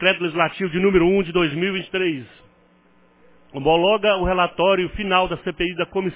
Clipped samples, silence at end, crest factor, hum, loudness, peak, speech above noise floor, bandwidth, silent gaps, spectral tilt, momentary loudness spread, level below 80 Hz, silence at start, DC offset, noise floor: under 0.1%; 0 s; 18 dB; none; -20 LUFS; -2 dBFS; 36 dB; 4 kHz; none; -9.5 dB/octave; 8 LU; -42 dBFS; 0 s; under 0.1%; -56 dBFS